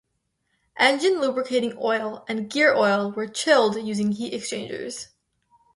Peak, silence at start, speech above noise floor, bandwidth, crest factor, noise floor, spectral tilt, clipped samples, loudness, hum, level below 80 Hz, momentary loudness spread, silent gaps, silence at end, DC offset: -4 dBFS; 0.75 s; 52 dB; 11.5 kHz; 20 dB; -75 dBFS; -3.5 dB/octave; under 0.1%; -23 LUFS; none; -68 dBFS; 13 LU; none; 0.7 s; under 0.1%